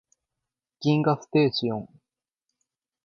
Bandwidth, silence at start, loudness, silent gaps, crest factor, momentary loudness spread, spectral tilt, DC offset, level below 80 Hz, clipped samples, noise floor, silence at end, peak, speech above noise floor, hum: 7.2 kHz; 0.8 s; -25 LUFS; none; 20 dB; 8 LU; -7 dB/octave; under 0.1%; -68 dBFS; under 0.1%; -86 dBFS; 1.2 s; -8 dBFS; 63 dB; none